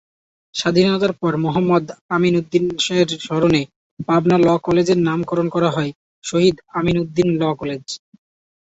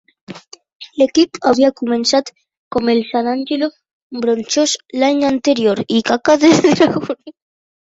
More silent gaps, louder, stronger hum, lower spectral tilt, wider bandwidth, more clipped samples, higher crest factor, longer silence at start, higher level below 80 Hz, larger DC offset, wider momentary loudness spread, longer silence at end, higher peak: first, 2.01-2.09 s, 3.76-3.97 s, 5.95-6.22 s vs 0.75-0.80 s, 2.57-2.71 s, 3.93-4.10 s; second, -18 LUFS vs -15 LUFS; neither; first, -6 dB/octave vs -4 dB/octave; about the same, 8 kHz vs 8 kHz; neither; about the same, 16 dB vs 14 dB; first, 0.55 s vs 0.3 s; about the same, -50 dBFS vs -54 dBFS; neither; second, 11 LU vs 16 LU; about the same, 0.65 s vs 0.6 s; about the same, -2 dBFS vs -2 dBFS